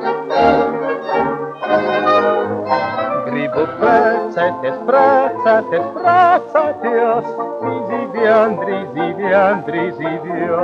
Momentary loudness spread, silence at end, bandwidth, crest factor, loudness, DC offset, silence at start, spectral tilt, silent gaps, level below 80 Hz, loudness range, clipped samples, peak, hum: 9 LU; 0 s; 7 kHz; 14 dB; -16 LUFS; under 0.1%; 0 s; -7 dB/octave; none; -56 dBFS; 3 LU; under 0.1%; -2 dBFS; none